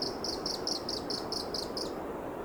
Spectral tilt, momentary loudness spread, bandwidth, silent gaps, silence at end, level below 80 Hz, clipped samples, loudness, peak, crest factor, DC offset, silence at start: -3 dB/octave; 4 LU; over 20 kHz; none; 0 s; -56 dBFS; under 0.1%; -35 LUFS; -20 dBFS; 16 dB; under 0.1%; 0 s